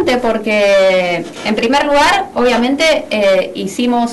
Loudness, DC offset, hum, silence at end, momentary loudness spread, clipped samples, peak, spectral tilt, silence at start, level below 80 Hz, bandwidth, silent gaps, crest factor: -13 LUFS; under 0.1%; none; 0 s; 7 LU; under 0.1%; -6 dBFS; -4 dB/octave; 0 s; -42 dBFS; 12.5 kHz; none; 8 dB